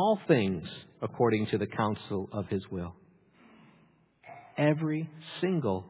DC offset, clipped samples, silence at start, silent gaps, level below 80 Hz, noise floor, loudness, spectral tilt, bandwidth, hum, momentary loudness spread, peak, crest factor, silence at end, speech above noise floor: under 0.1%; under 0.1%; 0 s; none; -58 dBFS; -64 dBFS; -31 LUFS; -6 dB/octave; 4 kHz; none; 15 LU; -10 dBFS; 20 dB; 0 s; 34 dB